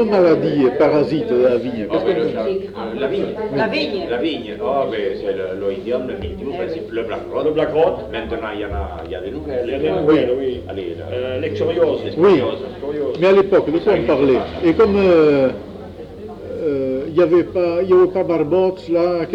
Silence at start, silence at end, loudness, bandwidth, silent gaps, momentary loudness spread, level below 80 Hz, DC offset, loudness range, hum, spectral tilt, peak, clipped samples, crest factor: 0 s; 0 s; -18 LUFS; 7.2 kHz; none; 12 LU; -42 dBFS; under 0.1%; 6 LU; none; -8 dB/octave; -2 dBFS; under 0.1%; 16 dB